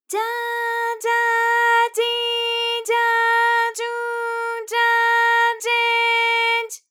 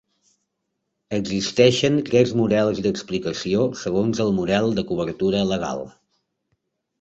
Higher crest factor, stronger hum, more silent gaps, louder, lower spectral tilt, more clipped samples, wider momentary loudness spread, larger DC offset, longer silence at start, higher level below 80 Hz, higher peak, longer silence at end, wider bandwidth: second, 12 dB vs 20 dB; neither; neither; first, -18 LUFS vs -21 LUFS; second, 4 dB/octave vs -5.5 dB/octave; neither; about the same, 8 LU vs 9 LU; neither; second, 0.1 s vs 1.1 s; second, under -90 dBFS vs -52 dBFS; second, -8 dBFS vs -2 dBFS; second, 0.15 s vs 1.1 s; first, 19.5 kHz vs 8.2 kHz